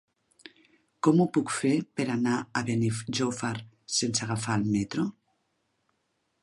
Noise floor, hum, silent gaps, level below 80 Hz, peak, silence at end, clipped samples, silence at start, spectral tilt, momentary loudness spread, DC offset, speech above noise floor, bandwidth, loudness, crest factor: -76 dBFS; none; none; -64 dBFS; -10 dBFS; 1.3 s; under 0.1%; 1.05 s; -5 dB/octave; 8 LU; under 0.1%; 49 dB; 11.5 kHz; -28 LUFS; 20 dB